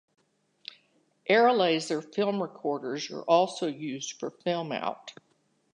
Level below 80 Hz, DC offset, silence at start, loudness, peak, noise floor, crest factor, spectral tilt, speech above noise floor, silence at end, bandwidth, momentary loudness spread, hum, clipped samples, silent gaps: -84 dBFS; under 0.1%; 1.25 s; -28 LUFS; -10 dBFS; -70 dBFS; 20 dB; -4 dB/octave; 43 dB; 0.65 s; 11 kHz; 22 LU; none; under 0.1%; none